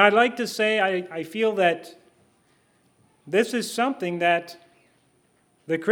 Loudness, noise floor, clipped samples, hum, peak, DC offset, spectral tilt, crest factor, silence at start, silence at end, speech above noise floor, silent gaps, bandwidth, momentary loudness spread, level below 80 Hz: -24 LUFS; -64 dBFS; under 0.1%; none; 0 dBFS; under 0.1%; -4 dB/octave; 24 dB; 0 s; 0 s; 42 dB; none; 19.5 kHz; 8 LU; -80 dBFS